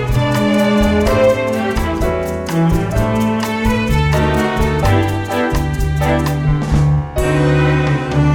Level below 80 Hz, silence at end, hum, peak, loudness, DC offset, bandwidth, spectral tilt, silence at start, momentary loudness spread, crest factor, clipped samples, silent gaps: -24 dBFS; 0 s; none; -2 dBFS; -15 LUFS; under 0.1%; 17.5 kHz; -6.5 dB/octave; 0 s; 5 LU; 12 dB; under 0.1%; none